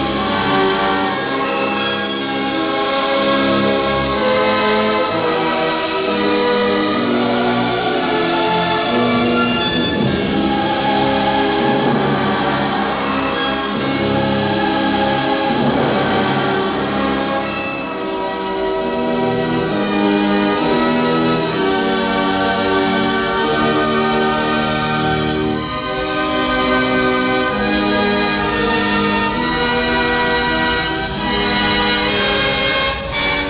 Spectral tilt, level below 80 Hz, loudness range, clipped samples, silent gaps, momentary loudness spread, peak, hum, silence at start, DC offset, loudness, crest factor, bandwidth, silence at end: -9 dB/octave; -38 dBFS; 1 LU; under 0.1%; none; 4 LU; -2 dBFS; none; 0 s; under 0.1%; -16 LUFS; 14 dB; 4 kHz; 0 s